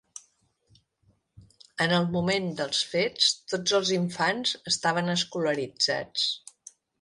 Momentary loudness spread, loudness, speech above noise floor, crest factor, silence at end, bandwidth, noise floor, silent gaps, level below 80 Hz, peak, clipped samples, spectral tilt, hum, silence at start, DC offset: 5 LU; -26 LUFS; 41 dB; 20 dB; 0.65 s; 11.5 kHz; -68 dBFS; none; -66 dBFS; -8 dBFS; under 0.1%; -3.5 dB/octave; none; 0.15 s; under 0.1%